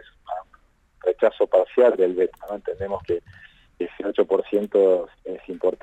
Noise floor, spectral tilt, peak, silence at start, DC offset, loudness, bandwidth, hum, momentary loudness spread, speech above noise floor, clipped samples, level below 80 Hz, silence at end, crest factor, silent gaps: -58 dBFS; -7.5 dB/octave; -6 dBFS; 0.3 s; under 0.1%; -22 LUFS; 8 kHz; none; 16 LU; 36 dB; under 0.1%; -58 dBFS; 0.05 s; 16 dB; none